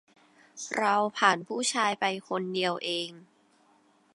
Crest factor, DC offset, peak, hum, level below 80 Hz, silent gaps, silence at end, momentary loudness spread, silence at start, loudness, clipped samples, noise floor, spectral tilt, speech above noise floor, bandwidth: 24 dB; under 0.1%; -8 dBFS; none; -84 dBFS; none; 0.9 s; 9 LU; 0.55 s; -28 LUFS; under 0.1%; -64 dBFS; -2.5 dB/octave; 36 dB; 11.5 kHz